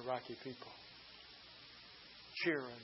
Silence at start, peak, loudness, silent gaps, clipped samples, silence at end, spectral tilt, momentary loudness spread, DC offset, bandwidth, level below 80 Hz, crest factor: 0 s; -24 dBFS; -45 LUFS; none; under 0.1%; 0 s; -2.5 dB/octave; 17 LU; under 0.1%; 5.8 kHz; -78 dBFS; 22 dB